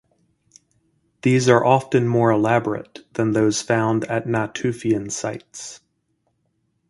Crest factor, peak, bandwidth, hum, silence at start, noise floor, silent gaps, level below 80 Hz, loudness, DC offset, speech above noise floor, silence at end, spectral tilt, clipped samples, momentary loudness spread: 22 dB; 0 dBFS; 11.5 kHz; none; 1.25 s; -70 dBFS; none; -58 dBFS; -20 LUFS; under 0.1%; 50 dB; 1.15 s; -5.5 dB/octave; under 0.1%; 15 LU